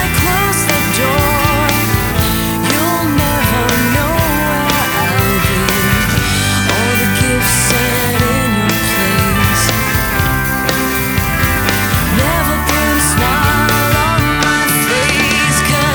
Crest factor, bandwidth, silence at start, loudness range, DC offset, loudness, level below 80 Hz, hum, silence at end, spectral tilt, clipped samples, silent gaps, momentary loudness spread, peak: 12 dB; over 20 kHz; 0 s; 1 LU; under 0.1%; -12 LUFS; -26 dBFS; none; 0 s; -4 dB/octave; under 0.1%; none; 2 LU; 0 dBFS